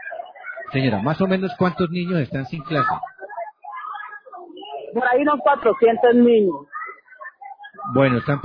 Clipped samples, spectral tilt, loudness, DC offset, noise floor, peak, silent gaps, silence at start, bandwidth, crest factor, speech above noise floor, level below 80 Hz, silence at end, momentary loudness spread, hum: under 0.1%; -9.5 dB/octave; -19 LUFS; under 0.1%; -41 dBFS; -4 dBFS; none; 0 s; 5.4 kHz; 18 dB; 23 dB; -56 dBFS; 0 s; 22 LU; none